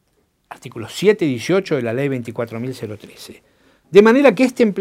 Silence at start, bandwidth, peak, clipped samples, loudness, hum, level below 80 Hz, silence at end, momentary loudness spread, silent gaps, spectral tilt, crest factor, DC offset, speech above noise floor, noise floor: 0.5 s; 15.5 kHz; 0 dBFS; under 0.1%; -16 LUFS; none; -60 dBFS; 0 s; 23 LU; none; -6 dB/octave; 18 dB; under 0.1%; 47 dB; -64 dBFS